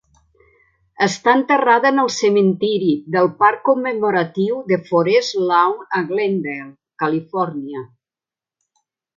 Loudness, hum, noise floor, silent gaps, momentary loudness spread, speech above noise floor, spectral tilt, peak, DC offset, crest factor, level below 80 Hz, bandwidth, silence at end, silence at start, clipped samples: -17 LUFS; none; -90 dBFS; none; 9 LU; 73 dB; -5 dB/octave; 0 dBFS; under 0.1%; 18 dB; -66 dBFS; 7.6 kHz; 1.3 s; 1 s; under 0.1%